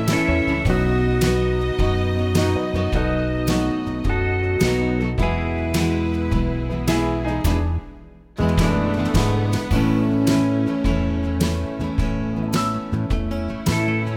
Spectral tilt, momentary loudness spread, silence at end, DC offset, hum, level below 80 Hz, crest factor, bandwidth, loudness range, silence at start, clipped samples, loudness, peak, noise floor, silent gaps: -6.5 dB/octave; 5 LU; 0 s; under 0.1%; none; -28 dBFS; 16 dB; 17 kHz; 2 LU; 0 s; under 0.1%; -21 LUFS; -4 dBFS; -42 dBFS; none